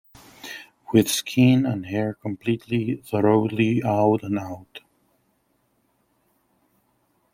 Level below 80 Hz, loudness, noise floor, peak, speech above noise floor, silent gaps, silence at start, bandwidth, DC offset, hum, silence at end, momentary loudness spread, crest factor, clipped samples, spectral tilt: -62 dBFS; -22 LUFS; -68 dBFS; -4 dBFS; 47 dB; none; 0.45 s; 16.5 kHz; under 0.1%; none; 2.55 s; 19 LU; 20 dB; under 0.1%; -6 dB/octave